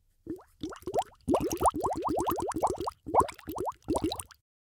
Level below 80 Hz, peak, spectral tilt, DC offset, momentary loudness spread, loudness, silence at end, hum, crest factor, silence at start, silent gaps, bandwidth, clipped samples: -52 dBFS; -10 dBFS; -5 dB/octave; under 0.1%; 13 LU; -31 LUFS; 0.45 s; none; 22 dB; 0.25 s; none; 18 kHz; under 0.1%